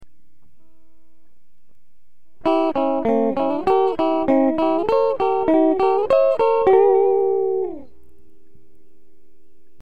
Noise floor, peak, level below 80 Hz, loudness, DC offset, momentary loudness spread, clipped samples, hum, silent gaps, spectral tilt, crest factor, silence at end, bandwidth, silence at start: -69 dBFS; -4 dBFS; -54 dBFS; -18 LUFS; 2%; 6 LU; under 0.1%; none; none; -7.5 dB/octave; 16 dB; 1.95 s; 5.2 kHz; 0 s